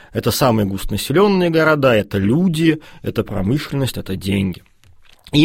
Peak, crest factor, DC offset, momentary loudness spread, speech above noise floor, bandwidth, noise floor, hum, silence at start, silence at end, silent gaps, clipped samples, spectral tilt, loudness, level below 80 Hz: -2 dBFS; 16 dB; under 0.1%; 10 LU; 30 dB; 16.5 kHz; -46 dBFS; none; 0.15 s; 0 s; none; under 0.1%; -6 dB/octave; -17 LUFS; -38 dBFS